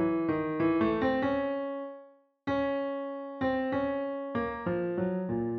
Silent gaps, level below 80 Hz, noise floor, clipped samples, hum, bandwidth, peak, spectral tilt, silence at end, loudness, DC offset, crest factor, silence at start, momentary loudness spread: none; -58 dBFS; -55 dBFS; under 0.1%; none; 5.8 kHz; -16 dBFS; -9 dB/octave; 0 s; -31 LUFS; under 0.1%; 14 dB; 0 s; 10 LU